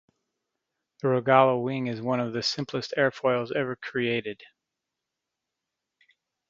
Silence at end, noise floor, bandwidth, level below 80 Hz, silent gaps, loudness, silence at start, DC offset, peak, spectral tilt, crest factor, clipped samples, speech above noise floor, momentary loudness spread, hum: 2.05 s; -86 dBFS; 7.6 kHz; -70 dBFS; none; -26 LUFS; 1.05 s; under 0.1%; -4 dBFS; -5.5 dB/octave; 24 dB; under 0.1%; 60 dB; 11 LU; none